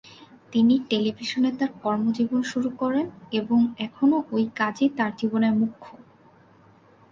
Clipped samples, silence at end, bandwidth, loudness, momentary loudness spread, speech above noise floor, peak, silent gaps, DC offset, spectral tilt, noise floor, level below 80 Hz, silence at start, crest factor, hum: under 0.1%; 1.15 s; 7.4 kHz; -24 LUFS; 6 LU; 31 dB; -8 dBFS; none; under 0.1%; -6 dB/octave; -55 dBFS; -66 dBFS; 0.5 s; 16 dB; none